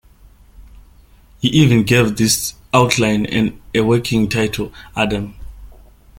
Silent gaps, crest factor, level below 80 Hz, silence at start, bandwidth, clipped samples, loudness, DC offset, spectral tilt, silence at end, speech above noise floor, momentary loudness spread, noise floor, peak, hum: none; 18 dB; -40 dBFS; 0.6 s; 17 kHz; under 0.1%; -16 LUFS; under 0.1%; -5 dB/octave; 0.5 s; 31 dB; 9 LU; -46 dBFS; 0 dBFS; none